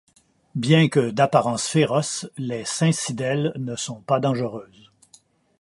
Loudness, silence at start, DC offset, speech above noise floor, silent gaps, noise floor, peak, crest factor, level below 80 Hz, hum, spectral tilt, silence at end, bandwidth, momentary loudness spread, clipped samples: -22 LUFS; 0.55 s; under 0.1%; 35 dB; none; -57 dBFS; -4 dBFS; 20 dB; -64 dBFS; none; -5 dB/octave; 0.95 s; 11.5 kHz; 11 LU; under 0.1%